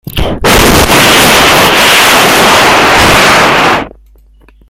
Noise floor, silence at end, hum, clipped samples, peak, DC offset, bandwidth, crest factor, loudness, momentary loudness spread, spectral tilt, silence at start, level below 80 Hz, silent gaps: -40 dBFS; 0.8 s; none; 2%; 0 dBFS; under 0.1%; over 20 kHz; 6 dB; -4 LUFS; 7 LU; -2.5 dB/octave; 0.05 s; -22 dBFS; none